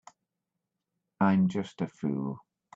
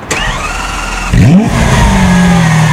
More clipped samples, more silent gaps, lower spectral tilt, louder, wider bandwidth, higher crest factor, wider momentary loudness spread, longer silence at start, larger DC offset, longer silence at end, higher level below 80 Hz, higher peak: second, under 0.1% vs 1%; neither; first, -8 dB/octave vs -5.5 dB/octave; second, -30 LUFS vs -9 LUFS; second, 7.6 kHz vs 14.5 kHz; first, 18 dB vs 8 dB; first, 12 LU vs 9 LU; first, 1.2 s vs 0 s; neither; first, 0.35 s vs 0 s; second, -72 dBFS vs -16 dBFS; second, -12 dBFS vs 0 dBFS